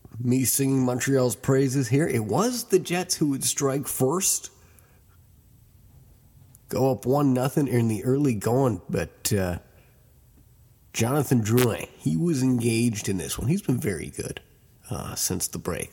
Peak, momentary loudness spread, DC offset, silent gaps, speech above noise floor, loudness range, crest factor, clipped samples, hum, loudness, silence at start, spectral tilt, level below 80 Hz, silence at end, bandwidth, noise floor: -6 dBFS; 9 LU; under 0.1%; none; 32 dB; 5 LU; 18 dB; under 0.1%; none; -24 LUFS; 0.15 s; -5 dB/octave; -52 dBFS; 0.05 s; 17.5 kHz; -56 dBFS